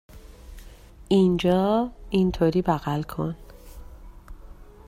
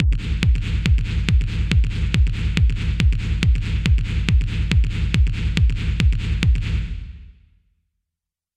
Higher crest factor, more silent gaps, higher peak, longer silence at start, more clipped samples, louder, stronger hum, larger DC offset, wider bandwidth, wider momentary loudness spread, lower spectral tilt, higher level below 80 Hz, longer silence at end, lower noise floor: about the same, 18 dB vs 16 dB; neither; second, -8 dBFS vs -2 dBFS; first, 0.15 s vs 0 s; neither; about the same, -23 LUFS vs -21 LUFS; neither; neither; first, 15.5 kHz vs 9.2 kHz; first, 10 LU vs 1 LU; first, -7.5 dB/octave vs -6 dB/octave; second, -44 dBFS vs -20 dBFS; second, 0.25 s vs 1.25 s; second, -46 dBFS vs -85 dBFS